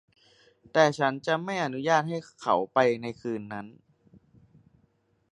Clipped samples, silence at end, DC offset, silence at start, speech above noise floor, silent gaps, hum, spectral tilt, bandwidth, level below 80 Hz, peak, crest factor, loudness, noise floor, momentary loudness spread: under 0.1%; 1.6 s; under 0.1%; 0.75 s; 42 dB; none; none; -5 dB/octave; 10.5 kHz; -72 dBFS; -6 dBFS; 22 dB; -27 LUFS; -69 dBFS; 12 LU